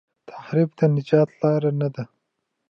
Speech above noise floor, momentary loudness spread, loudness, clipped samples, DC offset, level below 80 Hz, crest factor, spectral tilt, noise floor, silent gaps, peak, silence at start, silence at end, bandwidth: 57 dB; 17 LU; -21 LUFS; under 0.1%; under 0.1%; -72 dBFS; 18 dB; -10 dB/octave; -77 dBFS; none; -4 dBFS; 0.3 s; 0.65 s; 6.4 kHz